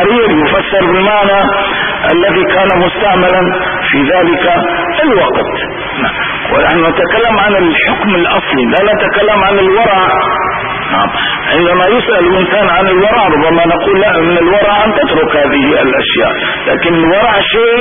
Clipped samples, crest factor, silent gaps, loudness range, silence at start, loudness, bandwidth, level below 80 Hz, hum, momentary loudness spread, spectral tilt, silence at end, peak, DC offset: under 0.1%; 10 dB; none; 2 LU; 0 s; -9 LUFS; 3.7 kHz; -34 dBFS; none; 4 LU; -8.5 dB/octave; 0 s; 0 dBFS; 0.6%